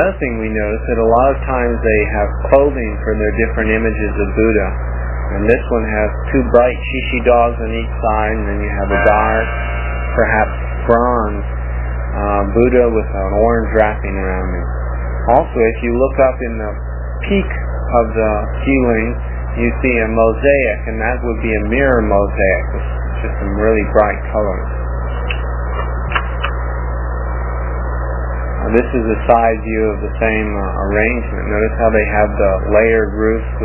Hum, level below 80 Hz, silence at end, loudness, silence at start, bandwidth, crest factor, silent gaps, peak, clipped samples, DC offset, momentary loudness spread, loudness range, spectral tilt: 60 Hz at -20 dBFS; -20 dBFS; 0 s; -16 LUFS; 0 s; 3.2 kHz; 14 dB; none; 0 dBFS; under 0.1%; under 0.1%; 9 LU; 3 LU; -11 dB/octave